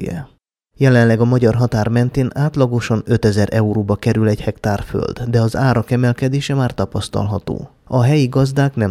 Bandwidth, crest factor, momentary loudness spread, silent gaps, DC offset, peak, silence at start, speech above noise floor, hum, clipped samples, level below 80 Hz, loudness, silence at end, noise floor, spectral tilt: 13 kHz; 14 dB; 8 LU; none; under 0.1%; -2 dBFS; 0 s; 39 dB; none; under 0.1%; -40 dBFS; -16 LUFS; 0 s; -54 dBFS; -7.5 dB/octave